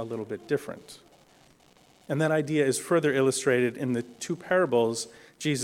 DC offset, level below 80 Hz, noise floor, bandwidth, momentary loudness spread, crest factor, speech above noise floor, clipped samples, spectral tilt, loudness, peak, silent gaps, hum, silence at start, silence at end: under 0.1%; -70 dBFS; -59 dBFS; 16.5 kHz; 11 LU; 16 dB; 32 dB; under 0.1%; -5 dB/octave; -27 LUFS; -12 dBFS; none; none; 0 s; 0 s